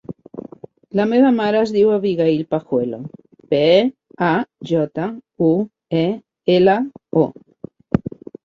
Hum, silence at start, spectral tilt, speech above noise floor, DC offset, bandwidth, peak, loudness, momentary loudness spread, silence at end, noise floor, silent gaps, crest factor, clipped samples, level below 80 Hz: none; 0.1 s; -8 dB/octave; 23 dB; under 0.1%; 7.6 kHz; -2 dBFS; -18 LUFS; 18 LU; 0.35 s; -40 dBFS; none; 16 dB; under 0.1%; -52 dBFS